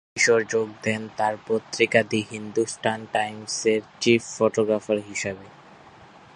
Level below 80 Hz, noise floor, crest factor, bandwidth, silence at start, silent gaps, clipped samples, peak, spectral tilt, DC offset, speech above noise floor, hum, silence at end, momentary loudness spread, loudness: -64 dBFS; -49 dBFS; 22 dB; 11.5 kHz; 0.15 s; none; under 0.1%; -2 dBFS; -3.5 dB/octave; under 0.1%; 25 dB; none; 0.3 s; 8 LU; -24 LUFS